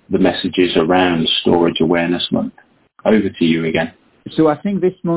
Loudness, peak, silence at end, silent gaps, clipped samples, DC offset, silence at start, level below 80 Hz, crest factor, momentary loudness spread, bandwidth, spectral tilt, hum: -16 LUFS; 0 dBFS; 0 s; none; under 0.1%; under 0.1%; 0.1 s; -46 dBFS; 16 dB; 8 LU; 4 kHz; -10 dB/octave; none